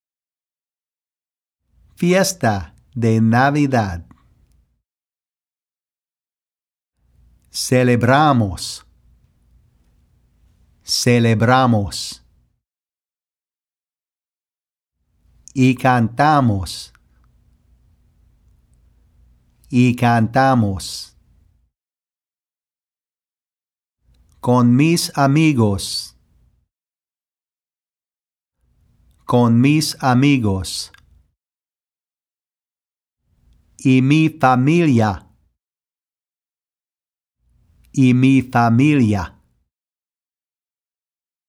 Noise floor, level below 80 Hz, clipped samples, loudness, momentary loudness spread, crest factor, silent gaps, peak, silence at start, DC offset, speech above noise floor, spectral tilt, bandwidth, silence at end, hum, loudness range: under -90 dBFS; -50 dBFS; under 0.1%; -16 LUFS; 15 LU; 20 dB; none; 0 dBFS; 2 s; under 0.1%; over 75 dB; -6 dB/octave; 16 kHz; 2.2 s; none; 8 LU